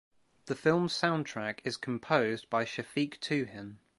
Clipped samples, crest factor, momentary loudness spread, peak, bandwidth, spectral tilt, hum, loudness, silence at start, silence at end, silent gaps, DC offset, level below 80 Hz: under 0.1%; 22 dB; 8 LU; -10 dBFS; 11.5 kHz; -5.5 dB/octave; none; -32 LUFS; 0.45 s; 0.2 s; none; under 0.1%; -72 dBFS